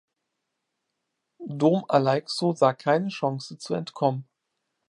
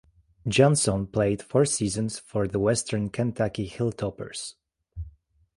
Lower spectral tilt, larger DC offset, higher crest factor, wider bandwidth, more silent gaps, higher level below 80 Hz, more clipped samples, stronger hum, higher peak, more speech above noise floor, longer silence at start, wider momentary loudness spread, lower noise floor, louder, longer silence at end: first, -6.5 dB/octave vs -5 dB/octave; neither; about the same, 20 dB vs 20 dB; about the same, 11.5 kHz vs 11.5 kHz; neither; second, -76 dBFS vs -50 dBFS; neither; neither; about the same, -6 dBFS vs -6 dBFS; first, 57 dB vs 27 dB; first, 1.4 s vs 0.45 s; second, 13 LU vs 16 LU; first, -81 dBFS vs -52 dBFS; about the same, -25 LUFS vs -26 LUFS; first, 0.65 s vs 0.5 s